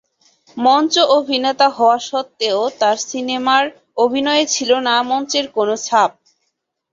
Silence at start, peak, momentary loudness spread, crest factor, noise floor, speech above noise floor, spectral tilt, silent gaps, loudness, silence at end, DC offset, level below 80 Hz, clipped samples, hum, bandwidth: 0.55 s; -2 dBFS; 7 LU; 16 dB; -72 dBFS; 56 dB; -1.5 dB/octave; none; -16 LUFS; 0.85 s; under 0.1%; -66 dBFS; under 0.1%; none; 7.8 kHz